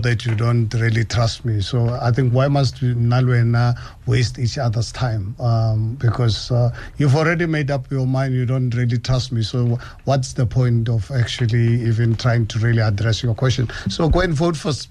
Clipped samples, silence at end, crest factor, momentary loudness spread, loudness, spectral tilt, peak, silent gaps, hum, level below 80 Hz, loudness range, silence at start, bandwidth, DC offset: under 0.1%; 0.05 s; 14 dB; 5 LU; -19 LUFS; -6.5 dB/octave; -4 dBFS; none; none; -36 dBFS; 2 LU; 0 s; 10 kHz; under 0.1%